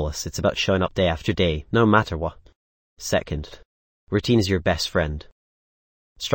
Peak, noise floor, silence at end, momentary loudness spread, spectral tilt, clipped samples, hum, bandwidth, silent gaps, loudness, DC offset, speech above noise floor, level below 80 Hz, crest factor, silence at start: -2 dBFS; under -90 dBFS; 0 s; 13 LU; -5 dB/octave; under 0.1%; none; 17 kHz; 2.56-2.97 s, 3.65-4.07 s, 5.32-6.16 s; -23 LUFS; under 0.1%; over 68 dB; -40 dBFS; 22 dB; 0 s